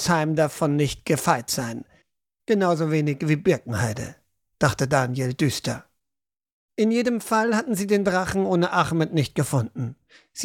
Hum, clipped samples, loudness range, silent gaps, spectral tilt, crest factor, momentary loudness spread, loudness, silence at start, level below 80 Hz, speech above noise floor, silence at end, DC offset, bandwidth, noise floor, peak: none; under 0.1%; 3 LU; 6.52-6.69 s; -5.5 dB/octave; 18 dB; 12 LU; -23 LUFS; 0 s; -54 dBFS; 65 dB; 0 s; under 0.1%; 17 kHz; -87 dBFS; -4 dBFS